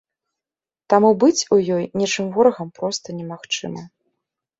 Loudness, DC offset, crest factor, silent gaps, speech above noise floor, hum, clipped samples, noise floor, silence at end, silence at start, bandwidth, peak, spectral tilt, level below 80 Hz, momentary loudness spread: -19 LUFS; under 0.1%; 18 dB; none; over 71 dB; none; under 0.1%; under -90 dBFS; 0.7 s; 0.9 s; 8 kHz; -2 dBFS; -4.5 dB/octave; -64 dBFS; 16 LU